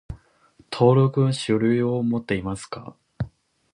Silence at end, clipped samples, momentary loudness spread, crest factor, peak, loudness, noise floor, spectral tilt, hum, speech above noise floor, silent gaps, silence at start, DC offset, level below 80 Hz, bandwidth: 0.45 s; under 0.1%; 19 LU; 18 dB; -6 dBFS; -22 LUFS; -58 dBFS; -7 dB/octave; none; 36 dB; none; 0.1 s; under 0.1%; -48 dBFS; 11 kHz